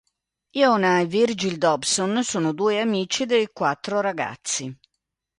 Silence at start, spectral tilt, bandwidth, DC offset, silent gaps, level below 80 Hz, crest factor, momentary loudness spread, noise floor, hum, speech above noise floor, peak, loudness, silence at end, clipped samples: 0.55 s; -3.5 dB/octave; 11.5 kHz; under 0.1%; none; -66 dBFS; 18 dB; 8 LU; -81 dBFS; none; 59 dB; -4 dBFS; -22 LUFS; 0.65 s; under 0.1%